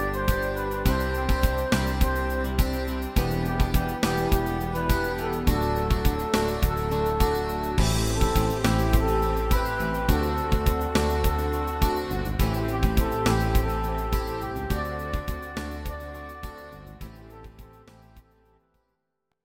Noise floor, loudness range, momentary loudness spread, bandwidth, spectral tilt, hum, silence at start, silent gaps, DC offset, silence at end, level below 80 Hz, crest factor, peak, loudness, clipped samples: -79 dBFS; 11 LU; 10 LU; 17 kHz; -5.5 dB/octave; none; 0 s; none; under 0.1%; 1.25 s; -28 dBFS; 18 dB; -6 dBFS; -26 LUFS; under 0.1%